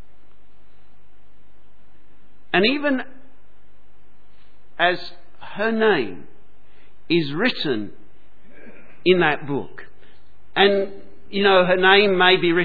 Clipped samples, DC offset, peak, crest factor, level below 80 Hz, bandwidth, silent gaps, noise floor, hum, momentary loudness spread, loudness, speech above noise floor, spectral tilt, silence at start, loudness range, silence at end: under 0.1%; 3%; 0 dBFS; 22 dB; -58 dBFS; 4.9 kHz; none; -58 dBFS; none; 16 LU; -19 LUFS; 39 dB; -7.5 dB/octave; 2.55 s; 7 LU; 0 s